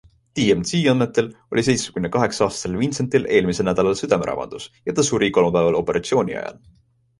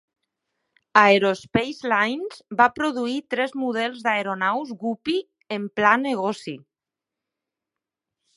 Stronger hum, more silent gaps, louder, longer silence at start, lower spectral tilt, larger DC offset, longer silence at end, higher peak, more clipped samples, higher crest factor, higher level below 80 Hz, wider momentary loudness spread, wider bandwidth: neither; neither; about the same, -20 LUFS vs -22 LUFS; second, 0.35 s vs 0.95 s; about the same, -5 dB/octave vs -5 dB/octave; neither; second, 0.7 s vs 1.8 s; about the same, -2 dBFS vs 0 dBFS; neither; second, 18 dB vs 24 dB; first, -48 dBFS vs -62 dBFS; second, 9 LU vs 13 LU; about the same, 11.5 kHz vs 11.5 kHz